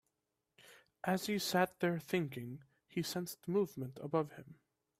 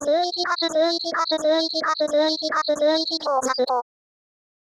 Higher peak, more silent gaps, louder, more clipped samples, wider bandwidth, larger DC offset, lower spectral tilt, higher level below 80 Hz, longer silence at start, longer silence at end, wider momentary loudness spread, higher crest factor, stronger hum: second, -18 dBFS vs -10 dBFS; neither; second, -38 LUFS vs -22 LUFS; neither; first, 16 kHz vs 12.5 kHz; neither; first, -5 dB/octave vs -1.5 dB/octave; second, -78 dBFS vs -72 dBFS; first, 0.7 s vs 0 s; second, 0.45 s vs 0.8 s; first, 12 LU vs 3 LU; first, 22 dB vs 12 dB; neither